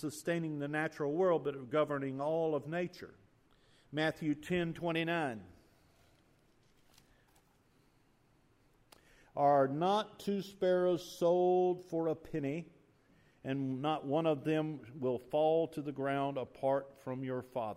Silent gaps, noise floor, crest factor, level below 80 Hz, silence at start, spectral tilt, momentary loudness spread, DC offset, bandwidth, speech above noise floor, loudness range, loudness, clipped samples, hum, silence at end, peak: none; -70 dBFS; 18 dB; -72 dBFS; 0 s; -6.5 dB/octave; 10 LU; under 0.1%; 15.5 kHz; 35 dB; 6 LU; -35 LUFS; under 0.1%; none; 0 s; -18 dBFS